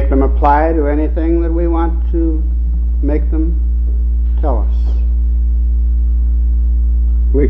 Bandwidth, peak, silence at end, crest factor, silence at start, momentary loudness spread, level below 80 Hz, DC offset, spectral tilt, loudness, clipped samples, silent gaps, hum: 2.7 kHz; 0 dBFS; 0 s; 12 dB; 0 s; 4 LU; -12 dBFS; under 0.1%; -11.5 dB/octave; -15 LUFS; under 0.1%; none; none